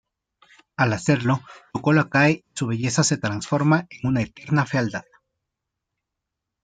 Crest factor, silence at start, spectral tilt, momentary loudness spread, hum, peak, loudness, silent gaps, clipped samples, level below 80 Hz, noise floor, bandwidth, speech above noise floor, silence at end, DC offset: 18 dB; 0.8 s; -5.5 dB/octave; 8 LU; none; -4 dBFS; -22 LUFS; none; under 0.1%; -58 dBFS; -83 dBFS; 9.6 kHz; 61 dB; 1.6 s; under 0.1%